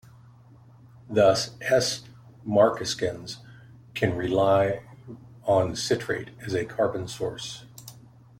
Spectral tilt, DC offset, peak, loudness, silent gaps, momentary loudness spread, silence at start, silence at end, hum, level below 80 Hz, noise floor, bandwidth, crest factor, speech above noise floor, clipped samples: -4.5 dB/octave; under 0.1%; -8 dBFS; -25 LUFS; none; 20 LU; 1.1 s; 0.4 s; none; -58 dBFS; -52 dBFS; 16.5 kHz; 20 dB; 27 dB; under 0.1%